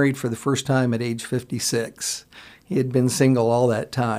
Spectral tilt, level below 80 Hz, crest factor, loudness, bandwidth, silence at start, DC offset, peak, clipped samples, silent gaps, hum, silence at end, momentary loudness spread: -5 dB/octave; -60 dBFS; 16 dB; -22 LUFS; 15.5 kHz; 0 s; under 0.1%; -6 dBFS; under 0.1%; none; none; 0 s; 9 LU